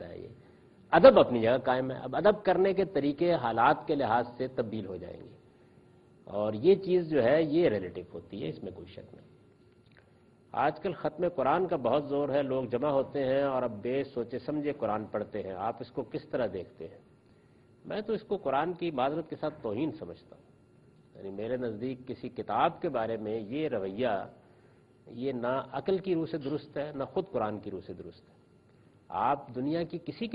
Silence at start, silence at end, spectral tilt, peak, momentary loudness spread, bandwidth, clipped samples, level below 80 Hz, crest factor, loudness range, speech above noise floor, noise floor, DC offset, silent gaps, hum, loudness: 0 s; 0 s; -9.5 dB/octave; -6 dBFS; 16 LU; 5.2 kHz; under 0.1%; -64 dBFS; 24 dB; 9 LU; 31 dB; -61 dBFS; under 0.1%; none; none; -30 LUFS